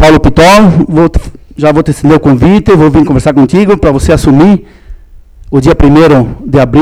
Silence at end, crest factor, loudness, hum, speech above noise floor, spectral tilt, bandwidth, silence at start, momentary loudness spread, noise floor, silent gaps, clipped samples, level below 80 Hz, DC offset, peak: 0 s; 6 dB; -6 LUFS; none; 27 dB; -7 dB/octave; 15.5 kHz; 0 s; 7 LU; -32 dBFS; none; 7%; -20 dBFS; under 0.1%; 0 dBFS